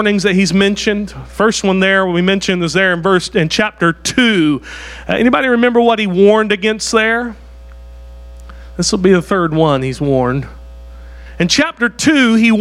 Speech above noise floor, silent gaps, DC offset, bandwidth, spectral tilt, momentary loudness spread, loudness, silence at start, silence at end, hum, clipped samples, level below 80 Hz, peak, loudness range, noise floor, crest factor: 21 dB; none; under 0.1%; 13 kHz; -4.5 dB/octave; 8 LU; -13 LUFS; 0 s; 0 s; none; under 0.1%; -36 dBFS; 0 dBFS; 3 LU; -34 dBFS; 14 dB